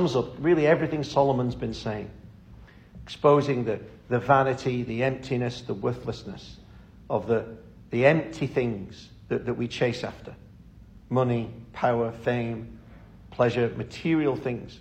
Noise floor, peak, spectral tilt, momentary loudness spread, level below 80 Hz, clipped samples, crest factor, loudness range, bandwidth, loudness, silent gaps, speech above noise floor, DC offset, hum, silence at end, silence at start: -49 dBFS; -6 dBFS; -7 dB/octave; 20 LU; -52 dBFS; under 0.1%; 20 dB; 4 LU; 9 kHz; -26 LUFS; none; 23 dB; under 0.1%; none; 0 s; 0 s